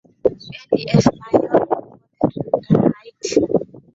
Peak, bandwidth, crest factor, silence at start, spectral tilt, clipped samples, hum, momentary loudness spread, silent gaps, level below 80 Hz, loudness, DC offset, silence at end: -2 dBFS; 8 kHz; 18 dB; 0.25 s; -7 dB/octave; under 0.1%; none; 7 LU; none; -48 dBFS; -19 LUFS; under 0.1%; 0.2 s